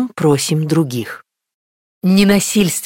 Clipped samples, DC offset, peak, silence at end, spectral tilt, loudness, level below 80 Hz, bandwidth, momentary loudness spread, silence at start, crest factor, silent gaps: under 0.1%; under 0.1%; -2 dBFS; 0 s; -5 dB/octave; -15 LUFS; -48 dBFS; 17 kHz; 13 LU; 0 s; 14 dB; 1.54-2.01 s